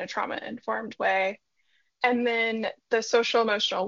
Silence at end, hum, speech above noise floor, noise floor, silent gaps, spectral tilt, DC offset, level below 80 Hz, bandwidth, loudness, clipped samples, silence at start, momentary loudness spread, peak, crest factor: 0 s; none; 45 dB; -71 dBFS; none; -0.5 dB/octave; under 0.1%; -76 dBFS; 7.4 kHz; -26 LUFS; under 0.1%; 0 s; 9 LU; -8 dBFS; 20 dB